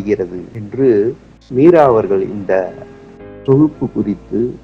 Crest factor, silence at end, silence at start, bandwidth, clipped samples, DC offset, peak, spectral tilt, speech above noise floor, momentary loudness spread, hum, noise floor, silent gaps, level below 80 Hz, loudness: 14 dB; 0.05 s; 0 s; 6.6 kHz; 0.1%; under 0.1%; 0 dBFS; -9.5 dB/octave; 21 dB; 16 LU; none; -35 dBFS; none; -46 dBFS; -14 LUFS